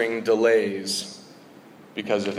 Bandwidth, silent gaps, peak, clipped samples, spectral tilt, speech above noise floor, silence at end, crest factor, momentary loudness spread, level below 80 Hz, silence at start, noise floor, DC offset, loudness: 14.5 kHz; none; -8 dBFS; under 0.1%; -3.5 dB/octave; 25 dB; 0 s; 16 dB; 18 LU; -76 dBFS; 0 s; -48 dBFS; under 0.1%; -23 LUFS